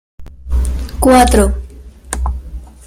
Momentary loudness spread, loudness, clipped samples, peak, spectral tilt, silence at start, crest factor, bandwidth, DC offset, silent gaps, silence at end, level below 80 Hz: 19 LU; -14 LUFS; under 0.1%; 0 dBFS; -5.5 dB/octave; 0.2 s; 14 dB; 15.5 kHz; under 0.1%; none; 0.15 s; -20 dBFS